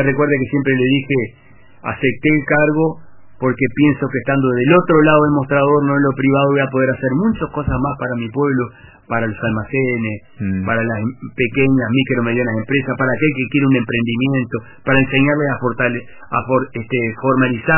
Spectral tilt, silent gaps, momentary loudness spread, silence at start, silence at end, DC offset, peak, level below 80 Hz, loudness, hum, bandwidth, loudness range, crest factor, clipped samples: -11 dB/octave; none; 8 LU; 0 s; 0 s; under 0.1%; 0 dBFS; -42 dBFS; -16 LUFS; none; 3.1 kHz; 6 LU; 16 dB; under 0.1%